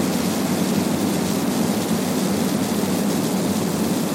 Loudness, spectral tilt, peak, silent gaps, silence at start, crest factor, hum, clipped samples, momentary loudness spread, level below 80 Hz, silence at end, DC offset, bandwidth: -21 LUFS; -5 dB/octave; -8 dBFS; none; 0 s; 12 dB; none; under 0.1%; 1 LU; -54 dBFS; 0 s; under 0.1%; 17 kHz